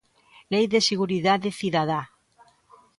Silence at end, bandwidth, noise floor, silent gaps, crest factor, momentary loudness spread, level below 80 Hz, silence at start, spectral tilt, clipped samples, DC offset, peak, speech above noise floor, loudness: 0.9 s; 11.5 kHz; -59 dBFS; none; 18 dB; 7 LU; -66 dBFS; 0.5 s; -4.5 dB/octave; under 0.1%; under 0.1%; -8 dBFS; 36 dB; -24 LUFS